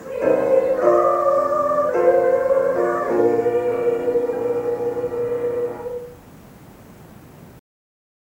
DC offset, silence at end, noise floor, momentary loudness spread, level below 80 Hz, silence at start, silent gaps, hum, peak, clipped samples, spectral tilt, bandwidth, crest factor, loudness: under 0.1%; 0.65 s; -43 dBFS; 8 LU; -56 dBFS; 0 s; none; none; -4 dBFS; under 0.1%; -7 dB/octave; 16.5 kHz; 16 dB; -19 LUFS